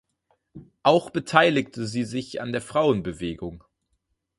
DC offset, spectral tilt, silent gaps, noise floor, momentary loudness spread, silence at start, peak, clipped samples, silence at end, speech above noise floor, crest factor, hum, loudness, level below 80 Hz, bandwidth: under 0.1%; -5.5 dB/octave; none; -75 dBFS; 13 LU; 0.55 s; -2 dBFS; under 0.1%; 0.8 s; 51 dB; 24 dB; none; -24 LUFS; -54 dBFS; 11.5 kHz